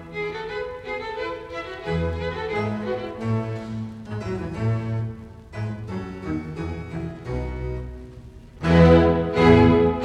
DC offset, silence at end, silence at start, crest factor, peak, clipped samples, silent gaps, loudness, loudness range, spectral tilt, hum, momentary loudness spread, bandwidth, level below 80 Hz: under 0.1%; 0 s; 0 s; 22 dB; -2 dBFS; under 0.1%; none; -23 LUFS; 11 LU; -8 dB/octave; none; 18 LU; 8.8 kHz; -36 dBFS